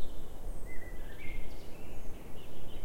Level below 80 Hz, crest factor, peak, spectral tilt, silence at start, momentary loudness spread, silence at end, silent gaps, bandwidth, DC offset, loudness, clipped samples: -42 dBFS; 10 dB; -18 dBFS; -5.5 dB/octave; 0 s; 4 LU; 0 s; none; 15.5 kHz; under 0.1%; -48 LUFS; under 0.1%